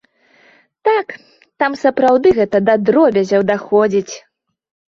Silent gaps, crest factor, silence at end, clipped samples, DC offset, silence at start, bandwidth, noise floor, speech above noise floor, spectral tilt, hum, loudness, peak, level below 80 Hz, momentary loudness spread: none; 14 dB; 0.7 s; under 0.1%; under 0.1%; 0.85 s; 7.4 kHz; -52 dBFS; 38 dB; -6 dB/octave; none; -14 LUFS; -2 dBFS; -54 dBFS; 8 LU